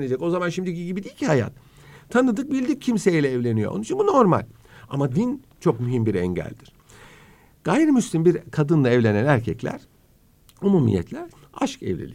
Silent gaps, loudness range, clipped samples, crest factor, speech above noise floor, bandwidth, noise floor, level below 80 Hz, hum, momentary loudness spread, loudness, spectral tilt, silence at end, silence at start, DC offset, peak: none; 3 LU; under 0.1%; 20 dB; 35 dB; 15.5 kHz; -57 dBFS; -54 dBFS; none; 12 LU; -22 LUFS; -7 dB/octave; 0 s; 0 s; under 0.1%; -2 dBFS